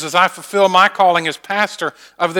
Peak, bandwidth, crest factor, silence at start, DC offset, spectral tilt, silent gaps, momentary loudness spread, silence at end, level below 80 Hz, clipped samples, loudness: 0 dBFS; 19 kHz; 16 dB; 0 s; under 0.1%; -3 dB/octave; none; 10 LU; 0 s; -68 dBFS; under 0.1%; -15 LUFS